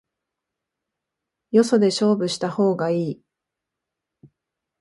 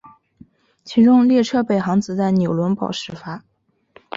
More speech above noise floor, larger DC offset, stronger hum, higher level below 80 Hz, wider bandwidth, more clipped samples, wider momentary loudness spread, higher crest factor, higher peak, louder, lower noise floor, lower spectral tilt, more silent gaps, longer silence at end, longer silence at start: first, 65 dB vs 35 dB; neither; neither; second, -70 dBFS vs -58 dBFS; first, 11.5 kHz vs 7.6 kHz; neither; second, 8 LU vs 18 LU; first, 20 dB vs 14 dB; about the same, -4 dBFS vs -4 dBFS; second, -21 LUFS vs -17 LUFS; first, -84 dBFS vs -52 dBFS; second, -5.5 dB/octave vs -7 dB/octave; neither; first, 1.65 s vs 0.8 s; first, 1.55 s vs 0.85 s